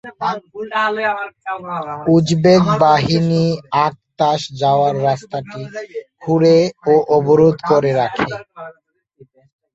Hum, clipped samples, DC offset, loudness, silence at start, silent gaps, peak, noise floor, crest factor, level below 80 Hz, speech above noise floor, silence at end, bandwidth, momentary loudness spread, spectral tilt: none; under 0.1%; under 0.1%; -16 LUFS; 0.05 s; none; 0 dBFS; -50 dBFS; 16 dB; -52 dBFS; 34 dB; 1.05 s; 8 kHz; 16 LU; -6.5 dB/octave